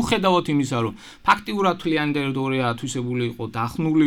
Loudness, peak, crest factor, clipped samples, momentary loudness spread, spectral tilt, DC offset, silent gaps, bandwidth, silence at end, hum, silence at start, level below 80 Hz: -23 LUFS; -4 dBFS; 18 dB; under 0.1%; 8 LU; -5.5 dB/octave; under 0.1%; none; 17.5 kHz; 0 s; none; 0 s; -50 dBFS